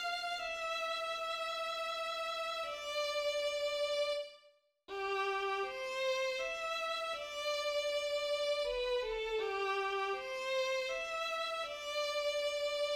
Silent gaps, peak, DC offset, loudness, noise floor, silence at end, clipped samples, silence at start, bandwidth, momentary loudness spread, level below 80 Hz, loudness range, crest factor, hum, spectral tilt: none; -24 dBFS; under 0.1%; -37 LUFS; -68 dBFS; 0 s; under 0.1%; 0 s; 16 kHz; 4 LU; -66 dBFS; 2 LU; 14 dB; none; -0.5 dB/octave